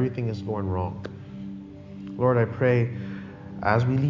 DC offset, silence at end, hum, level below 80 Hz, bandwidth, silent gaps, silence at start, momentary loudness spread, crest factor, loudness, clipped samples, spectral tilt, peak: under 0.1%; 0 s; none; -46 dBFS; 7.2 kHz; none; 0 s; 17 LU; 20 dB; -26 LUFS; under 0.1%; -9 dB/octave; -6 dBFS